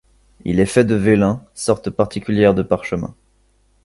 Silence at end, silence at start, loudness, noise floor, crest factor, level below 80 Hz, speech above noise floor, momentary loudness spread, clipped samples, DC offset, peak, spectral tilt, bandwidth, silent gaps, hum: 0.75 s; 0.45 s; -17 LUFS; -58 dBFS; 18 dB; -42 dBFS; 41 dB; 10 LU; under 0.1%; under 0.1%; 0 dBFS; -6.5 dB/octave; 11.5 kHz; none; none